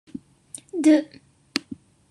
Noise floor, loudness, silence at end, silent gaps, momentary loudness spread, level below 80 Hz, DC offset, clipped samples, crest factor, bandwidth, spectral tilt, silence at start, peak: -46 dBFS; -23 LUFS; 0.35 s; none; 24 LU; -70 dBFS; under 0.1%; under 0.1%; 24 dB; 11.5 kHz; -3.5 dB/octave; 0.15 s; -2 dBFS